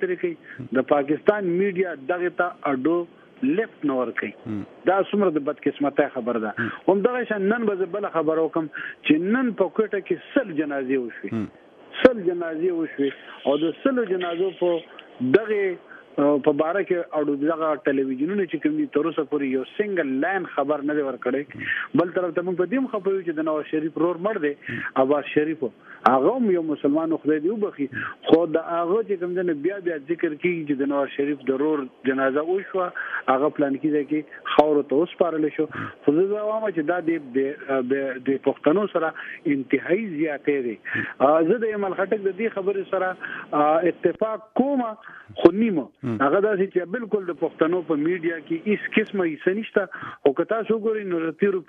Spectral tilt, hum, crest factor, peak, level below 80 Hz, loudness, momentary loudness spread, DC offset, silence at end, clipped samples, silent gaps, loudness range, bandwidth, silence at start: -8.5 dB/octave; none; 22 dB; 0 dBFS; -66 dBFS; -24 LUFS; 7 LU; under 0.1%; 0.05 s; under 0.1%; none; 2 LU; 4.9 kHz; 0 s